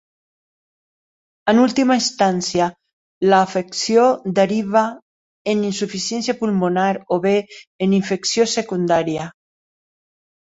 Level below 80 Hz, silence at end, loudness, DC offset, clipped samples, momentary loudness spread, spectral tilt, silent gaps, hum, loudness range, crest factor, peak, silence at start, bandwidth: -60 dBFS; 1.25 s; -18 LUFS; under 0.1%; under 0.1%; 8 LU; -4.5 dB/octave; 2.93-3.21 s, 5.02-5.45 s, 7.67-7.79 s; none; 3 LU; 18 dB; -2 dBFS; 1.45 s; 8 kHz